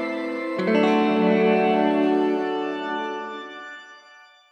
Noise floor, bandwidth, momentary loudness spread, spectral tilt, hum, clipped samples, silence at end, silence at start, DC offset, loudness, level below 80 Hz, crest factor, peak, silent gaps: -50 dBFS; 8.8 kHz; 16 LU; -7 dB/octave; none; under 0.1%; 0.55 s; 0 s; under 0.1%; -22 LUFS; -78 dBFS; 14 dB; -8 dBFS; none